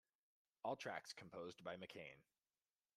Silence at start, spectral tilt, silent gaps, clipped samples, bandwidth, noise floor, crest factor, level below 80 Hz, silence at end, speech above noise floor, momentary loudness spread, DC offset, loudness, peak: 0.65 s; -4 dB/octave; none; under 0.1%; 13 kHz; under -90 dBFS; 22 dB; under -90 dBFS; 0.75 s; over 37 dB; 10 LU; under 0.1%; -52 LUFS; -34 dBFS